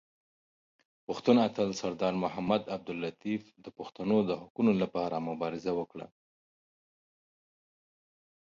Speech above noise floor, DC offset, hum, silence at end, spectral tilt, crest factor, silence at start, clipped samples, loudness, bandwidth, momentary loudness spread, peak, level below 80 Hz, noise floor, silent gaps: over 59 dB; under 0.1%; none; 2.5 s; -6.5 dB/octave; 22 dB; 1.1 s; under 0.1%; -31 LUFS; 7.6 kHz; 18 LU; -10 dBFS; -70 dBFS; under -90 dBFS; 4.50-4.55 s